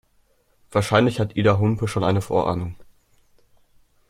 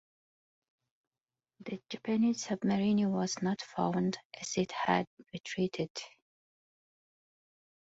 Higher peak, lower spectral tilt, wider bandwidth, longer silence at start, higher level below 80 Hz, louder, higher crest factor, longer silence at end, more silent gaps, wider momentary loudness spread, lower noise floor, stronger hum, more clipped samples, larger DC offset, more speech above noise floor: first, -2 dBFS vs -14 dBFS; first, -6.5 dB/octave vs -5 dB/octave; first, 14.5 kHz vs 8 kHz; second, 0.7 s vs 1.6 s; first, -50 dBFS vs -72 dBFS; first, -21 LUFS vs -33 LUFS; about the same, 22 dB vs 22 dB; second, 1.25 s vs 1.75 s; second, none vs 4.25-4.30 s, 5.07-5.17 s, 5.40-5.44 s, 5.90-5.95 s; second, 7 LU vs 14 LU; second, -62 dBFS vs -87 dBFS; neither; neither; neither; second, 42 dB vs 54 dB